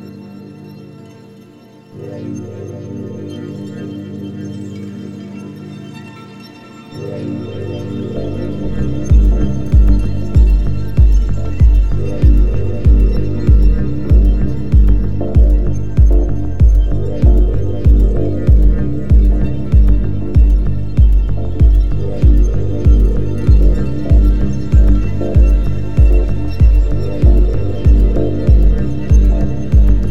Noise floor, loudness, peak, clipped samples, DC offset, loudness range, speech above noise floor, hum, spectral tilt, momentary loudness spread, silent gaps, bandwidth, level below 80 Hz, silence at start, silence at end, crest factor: -40 dBFS; -14 LUFS; 0 dBFS; under 0.1%; 10%; 14 LU; 21 dB; 50 Hz at -30 dBFS; -9.5 dB/octave; 16 LU; none; 6.6 kHz; -12 dBFS; 0 s; 0 s; 12 dB